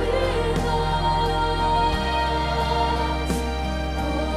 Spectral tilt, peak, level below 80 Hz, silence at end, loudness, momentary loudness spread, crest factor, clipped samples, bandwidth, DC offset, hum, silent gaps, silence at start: -5.5 dB/octave; -10 dBFS; -28 dBFS; 0 s; -23 LUFS; 4 LU; 12 dB; under 0.1%; 15 kHz; 0.4%; none; none; 0 s